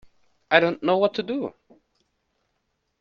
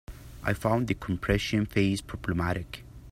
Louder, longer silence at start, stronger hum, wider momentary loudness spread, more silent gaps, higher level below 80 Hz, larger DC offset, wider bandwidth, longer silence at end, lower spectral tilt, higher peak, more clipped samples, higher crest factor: first, -22 LUFS vs -29 LUFS; first, 0.5 s vs 0.1 s; neither; about the same, 11 LU vs 11 LU; neither; second, -68 dBFS vs -44 dBFS; neither; second, 7 kHz vs 16 kHz; first, 1.5 s vs 0 s; about the same, -6.5 dB/octave vs -6 dB/octave; first, -2 dBFS vs -10 dBFS; neither; first, 26 dB vs 20 dB